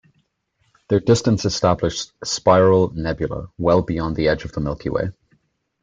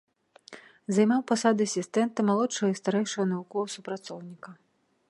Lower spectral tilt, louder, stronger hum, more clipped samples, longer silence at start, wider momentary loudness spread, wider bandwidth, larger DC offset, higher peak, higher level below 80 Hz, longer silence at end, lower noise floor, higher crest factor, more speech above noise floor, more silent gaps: about the same, -5.5 dB/octave vs -5 dB/octave; first, -19 LUFS vs -27 LUFS; neither; neither; first, 0.9 s vs 0.5 s; second, 11 LU vs 20 LU; second, 9.4 kHz vs 11.5 kHz; neither; first, -2 dBFS vs -8 dBFS; first, -42 dBFS vs -78 dBFS; first, 0.7 s vs 0.55 s; first, -67 dBFS vs -52 dBFS; about the same, 18 dB vs 20 dB; first, 48 dB vs 24 dB; neither